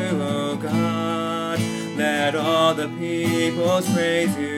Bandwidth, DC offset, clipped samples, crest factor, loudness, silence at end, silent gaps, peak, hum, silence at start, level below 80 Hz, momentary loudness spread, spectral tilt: 17 kHz; under 0.1%; under 0.1%; 16 dB; -22 LUFS; 0 s; none; -6 dBFS; none; 0 s; -66 dBFS; 6 LU; -5 dB/octave